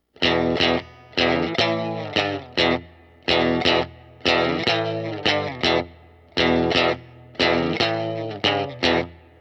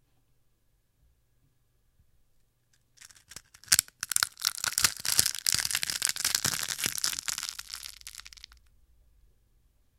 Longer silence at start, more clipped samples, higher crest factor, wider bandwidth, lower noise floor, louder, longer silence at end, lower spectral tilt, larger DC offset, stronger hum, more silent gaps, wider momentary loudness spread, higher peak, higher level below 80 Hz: second, 0.2 s vs 3.3 s; neither; second, 18 dB vs 34 dB; second, 8.6 kHz vs 17 kHz; second, -48 dBFS vs -70 dBFS; first, -21 LUFS vs -27 LUFS; second, 0.25 s vs 1.7 s; first, -5 dB/octave vs 1 dB/octave; neither; neither; neither; second, 8 LU vs 21 LU; second, -4 dBFS vs 0 dBFS; first, -48 dBFS vs -62 dBFS